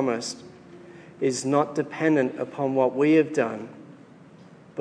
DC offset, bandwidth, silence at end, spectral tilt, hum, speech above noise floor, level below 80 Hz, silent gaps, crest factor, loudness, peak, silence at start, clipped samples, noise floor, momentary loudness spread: under 0.1%; 10.5 kHz; 0 s; -5.5 dB/octave; none; 26 dB; -76 dBFS; none; 18 dB; -24 LUFS; -8 dBFS; 0 s; under 0.1%; -49 dBFS; 19 LU